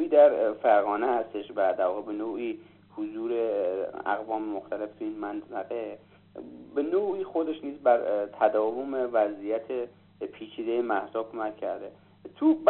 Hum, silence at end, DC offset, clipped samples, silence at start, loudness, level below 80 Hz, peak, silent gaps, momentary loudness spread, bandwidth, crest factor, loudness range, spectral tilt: 50 Hz at -60 dBFS; 0 s; under 0.1%; under 0.1%; 0 s; -28 LUFS; -74 dBFS; -8 dBFS; none; 16 LU; 4.2 kHz; 20 dB; 5 LU; -4 dB/octave